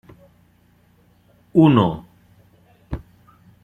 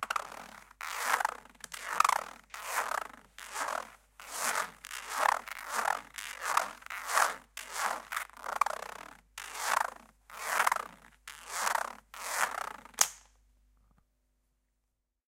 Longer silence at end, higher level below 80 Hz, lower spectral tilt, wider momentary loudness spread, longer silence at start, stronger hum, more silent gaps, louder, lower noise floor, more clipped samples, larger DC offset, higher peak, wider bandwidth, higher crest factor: second, 0.65 s vs 2.15 s; first, -46 dBFS vs -68 dBFS; first, -9.5 dB/octave vs 1 dB/octave; first, 21 LU vs 18 LU; first, 1.55 s vs 0 s; neither; neither; first, -16 LUFS vs -33 LUFS; second, -57 dBFS vs -82 dBFS; neither; neither; first, -2 dBFS vs -6 dBFS; second, 4.1 kHz vs 17 kHz; second, 20 dB vs 30 dB